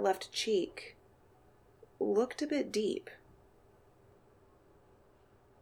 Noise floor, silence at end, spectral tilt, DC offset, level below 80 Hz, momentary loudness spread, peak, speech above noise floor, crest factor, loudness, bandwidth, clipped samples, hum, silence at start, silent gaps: -65 dBFS; 2.45 s; -3.5 dB/octave; under 0.1%; -72 dBFS; 19 LU; -18 dBFS; 31 dB; 20 dB; -34 LUFS; 17 kHz; under 0.1%; none; 0 s; none